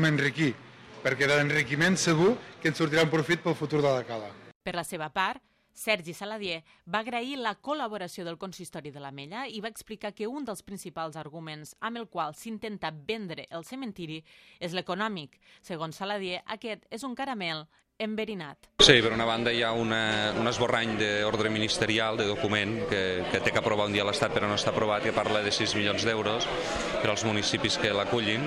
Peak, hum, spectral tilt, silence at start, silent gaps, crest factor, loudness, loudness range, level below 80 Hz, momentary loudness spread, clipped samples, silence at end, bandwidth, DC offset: -4 dBFS; none; -4 dB/octave; 0 s; 4.55-4.60 s; 26 dB; -28 LUFS; 12 LU; -56 dBFS; 15 LU; under 0.1%; 0 s; 15.5 kHz; under 0.1%